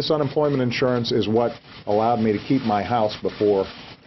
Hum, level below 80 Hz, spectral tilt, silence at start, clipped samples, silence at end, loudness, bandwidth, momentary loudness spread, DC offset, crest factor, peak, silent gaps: none; -54 dBFS; -7 dB/octave; 0 s; under 0.1%; 0.1 s; -22 LUFS; 6.2 kHz; 4 LU; under 0.1%; 14 dB; -8 dBFS; none